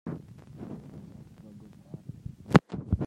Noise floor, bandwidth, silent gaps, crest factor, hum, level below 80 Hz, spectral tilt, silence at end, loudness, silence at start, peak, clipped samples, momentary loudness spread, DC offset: -50 dBFS; 12 kHz; none; 30 dB; none; -48 dBFS; -7.5 dB/octave; 0 s; -26 LUFS; 0.05 s; -2 dBFS; under 0.1%; 25 LU; under 0.1%